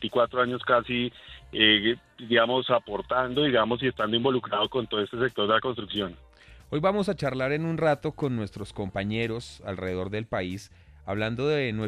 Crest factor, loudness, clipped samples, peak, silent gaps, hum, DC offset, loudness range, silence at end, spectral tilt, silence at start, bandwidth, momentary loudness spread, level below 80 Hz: 22 dB; -26 LUFS; under 0.1%; -4 dBFS; none; none; under 0.1%; 6 LU; 0 s; -6 dB/octave; 0 s; 13 kHz; 12 LU; -54 dBFS